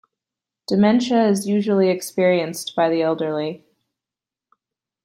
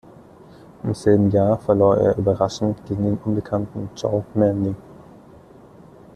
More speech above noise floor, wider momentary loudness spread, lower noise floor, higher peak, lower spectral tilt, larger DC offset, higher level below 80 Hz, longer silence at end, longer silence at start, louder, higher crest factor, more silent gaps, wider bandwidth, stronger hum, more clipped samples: first, 70 dB vs 26 dB; about the same, 10 LU vs 11 LU; first, -89 dBFS vs -46 dBFS; about the same, -4 dBFS vs -4 dBFS; second, -5.5 dB/octave vs -8 dB/octave; neither; second, -68 dBFS vs -50 dBFS; first, 1.5 s vs 1.2 s; second, 0.7 s vs 0.85 s; about the same, -19 LUFS vs -20 LUFS; about the same, 16 dB vs 18 dB; neither; first, 16 kHz vs 10.5 kHz; neither; neither